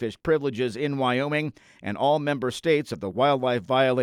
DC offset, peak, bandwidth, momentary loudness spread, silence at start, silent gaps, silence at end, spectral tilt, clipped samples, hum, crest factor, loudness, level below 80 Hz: under 0.1%; -10 dBFS; 13.5 kHz; 7 LU; 0 s; none; 0 s; -6 dB/octave; under 0.1%; none; 14 dB; -25 LUFS; -60 dBFS